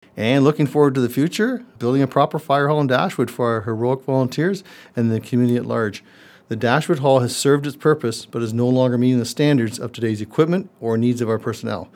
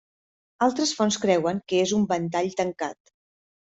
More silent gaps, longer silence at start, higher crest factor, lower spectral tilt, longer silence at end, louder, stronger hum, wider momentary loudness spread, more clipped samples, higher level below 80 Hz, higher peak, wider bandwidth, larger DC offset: neither; second, 0.15 s vs 0.6 s; about the same, 18 dB vs 18 dB; first, -6.5 dB/octave vs -4.5 dB/octave; second, 0.1 s vs 0.8 s; first, -19 LUFS vs -24 LUFS; neither; about the same, 8 LU vs 6 LU; neither; about the same, -66 dBFS vs -66 dBFS; first, 0 dBFS vs -8 dBFS; first, 17 kHz vs 8.2 kHz; neither